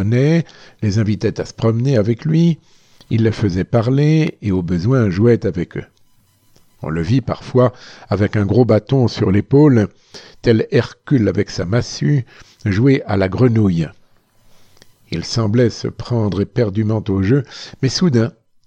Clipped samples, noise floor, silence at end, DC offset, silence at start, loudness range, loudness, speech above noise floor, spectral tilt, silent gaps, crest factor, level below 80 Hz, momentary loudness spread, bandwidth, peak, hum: under 0.1%; -54 dBFS; 0.35 s; under 0.1%; 0 s; 4 LU; -17 LUFS; 38 dB; -7.5 dB/octave; none; 16 dB; -44 dBFS; 10 LU; 8.2 kHz; 0 dBFS; none